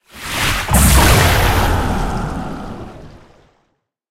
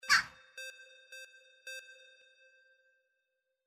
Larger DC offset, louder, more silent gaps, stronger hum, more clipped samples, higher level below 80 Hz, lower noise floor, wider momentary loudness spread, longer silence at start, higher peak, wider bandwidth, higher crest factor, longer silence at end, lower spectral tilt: neither; first, -14 LUFS vs -36 LUFS; neither; neither; neither; first, -20 dBFS vs -76 dBFS; second, -66 dBFS vs -84 dBFS; second, 19 LU vs 27 LU; about the same, 0.15 s vs 0.05 s; first, 0 dBFS vs -14 dBFS; about the same, 16.5 kHz vs 15.5 kHz; second, 16 dB vs 26 dB; second, 0.95 s vs 1.7 s; first, -4 dB/octave vs 1.5 dB/octave